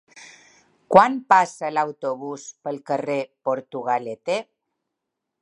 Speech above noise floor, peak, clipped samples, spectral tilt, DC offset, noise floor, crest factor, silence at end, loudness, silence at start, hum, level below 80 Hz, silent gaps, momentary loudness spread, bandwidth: 60 dB; 0 dBFS; under 0.1%; -5 dB/octave; under 0.1%; -82 dBFS; 24 dB; 1 s; -22 LUFS; 0.15 s; none; -66 dBFS; none; 15 LU; 11 kHz